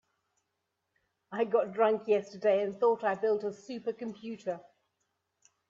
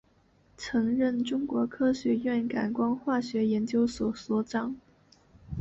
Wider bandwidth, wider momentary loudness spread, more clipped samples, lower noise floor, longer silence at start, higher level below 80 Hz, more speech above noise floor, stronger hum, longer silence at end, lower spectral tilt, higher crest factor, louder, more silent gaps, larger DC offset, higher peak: about the same, 7.6 kHz vs 8 kHz; first, 12 LU vs 6 LU; neither; first, -83 dBFS vs -64 dBFS; first, 1.3 s vs 0.6 s; second, -82 dBFS vs -56 dBFS; first, 53 dB vs 36 dB; neither; first, 1.1 s vs 0 s; about the same, -6 dB/octave vs -6 dB/octave; about the same, 18 dB vs 14 dB; about the same, -31 LUFS vs -29 LUFS; neither; neither; about the same, -14 dBFS vs -16 dBFS